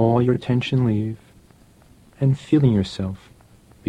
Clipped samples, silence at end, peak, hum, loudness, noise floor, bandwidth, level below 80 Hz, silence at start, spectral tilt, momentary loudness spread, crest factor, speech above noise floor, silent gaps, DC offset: under 0.1%; 0.75 s; -6 dBFS; none; -21 LUFS; -52 dBFS; 9.6 kHz; -50 dBFS; 0 s; -8.5 dB/octave; 13 LU; 16 dB; 32 dB; none; under 0.1%